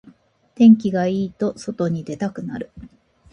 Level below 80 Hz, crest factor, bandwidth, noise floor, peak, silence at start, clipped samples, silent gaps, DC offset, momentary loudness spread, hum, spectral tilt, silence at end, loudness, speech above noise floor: -56 dBFS; 18 dB; 8.6 kHz; -51 dBFS; -2 dBFS; 0.6 s; under 0.1%; none; under 0.1%; 18 LU; none; -8 dB/octave; 0.45 s; -19 LUFS; 33 dB